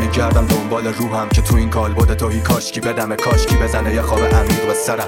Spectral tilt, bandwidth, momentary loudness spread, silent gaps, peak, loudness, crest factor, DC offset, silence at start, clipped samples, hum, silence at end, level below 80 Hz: -5.5 dB/octave; 17 kHz; 5 LU; none; -2 dBFS; -16 LUFS; 14 dB; under 0.1%; 0 s; under 0.1%; none; 0 s; -20 dBFS